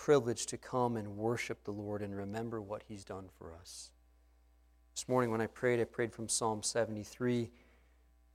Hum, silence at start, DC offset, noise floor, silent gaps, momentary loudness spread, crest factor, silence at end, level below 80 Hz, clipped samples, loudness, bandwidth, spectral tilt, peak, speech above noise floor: 60 Hz at -65 dBFS; 0 s; under 0.1%; -67 dBFS; none; 15 LU; 22 dB; 0.85 s; -66 dBFS; under 0.1%; -37 LUFS; 16 kHz; -4.5 dB/octave; -16 dBFS; 30 dB